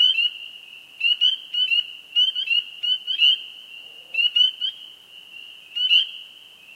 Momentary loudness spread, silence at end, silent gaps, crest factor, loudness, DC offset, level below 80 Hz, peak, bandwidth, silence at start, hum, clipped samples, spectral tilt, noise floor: 22 LU; 0.5 s; none; 18 dB; -19 LUFS; under 0.1%; -84 dBFS; -6 dBFS; 16 kHz; 0 s; none; under 0.1%; 3 dB/octave; -46 dBFS